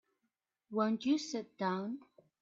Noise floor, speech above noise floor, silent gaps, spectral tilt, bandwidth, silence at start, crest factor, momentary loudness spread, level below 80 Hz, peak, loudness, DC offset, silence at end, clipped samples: -86 dBFS; 51 dB; none; -5 dB/octave; 7.8 kHz; 0.7 s; 20 dB; 10 LU; -84 dBFS; -18 dBFS; -36 LUFS; under 0.1%; 0.4 s; under 0.1%